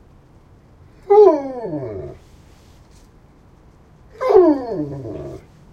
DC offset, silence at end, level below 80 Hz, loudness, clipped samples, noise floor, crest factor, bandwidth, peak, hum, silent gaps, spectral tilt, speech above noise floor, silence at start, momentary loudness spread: under 0.1%; 0.35 s; -50 dBFS; -16 LUFS; under 0.1%; -48 dBFS; 20 dB; 6.6 kHz; 0 dBFS; none; none; -8.5 dB/octave; 21 dB; 1.1 s; 22 LU